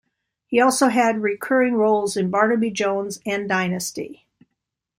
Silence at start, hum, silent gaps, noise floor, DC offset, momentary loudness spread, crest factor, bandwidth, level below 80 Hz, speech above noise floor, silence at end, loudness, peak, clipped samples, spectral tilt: 0.5 s; none; none; -80 dBFS; under 0.1%; 9 LU; 18 dB; 16 kHz; -64 dBFS; 60 dB; 0.85 s; -20 LUFS; -4 dBFS; under 0.1%; -4.5 dB/octave